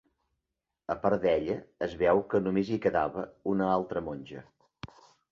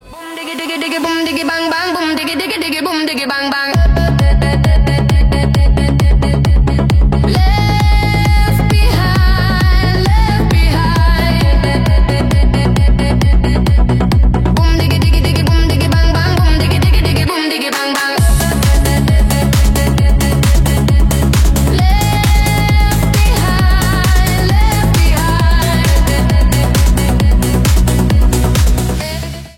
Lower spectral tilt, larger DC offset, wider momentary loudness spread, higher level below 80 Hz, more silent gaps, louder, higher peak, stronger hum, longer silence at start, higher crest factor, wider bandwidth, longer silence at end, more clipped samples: first, -8 dB/octave vs -5.5 dB/octave; neither; first, 21 LU vs 4 LU; second, -58 dBFS vs -12 dBFS; neither; second, -29 LUFS vs -12 LUFS; second, -12 dBFS vs 0 dBFS; neither; first, 0.9 s vs 0.05 s; first, 20 dB vs 10 dB; second, 7.2 kHz vs 16.5 kHz; first, 0.45 s vs 0.05 s; neither